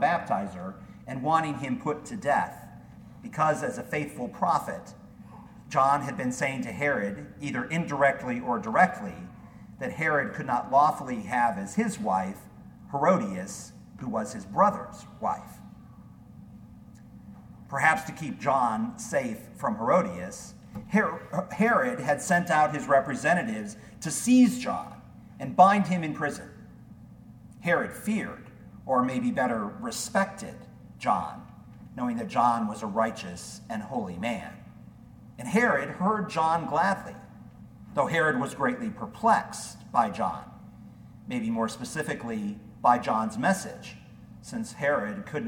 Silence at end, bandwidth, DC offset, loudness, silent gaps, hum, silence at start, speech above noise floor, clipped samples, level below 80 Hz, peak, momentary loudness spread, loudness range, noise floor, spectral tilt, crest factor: 0 s; 18 kHz; under 0.1%; -27 LUFS; none; none; 0 s; 22 dB; under 0.1%; -60 dBFS; -6 dBFS; 20 LU; 6 LU; -49 dBFS; -5.5 dB/octave; 22 dB